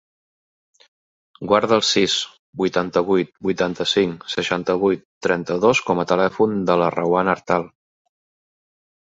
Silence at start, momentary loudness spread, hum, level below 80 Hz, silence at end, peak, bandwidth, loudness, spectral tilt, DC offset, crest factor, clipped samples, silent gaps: 1.4 s; 7 LU; none; -56 dBFS; 1.5 s; -2 dBFS; 8 kHz; -20 LUFS; -4.5 dB/octave; under 0.1%; 20 dB; under 0.1%; 2.39-2.53 s, 5.05-5.21 s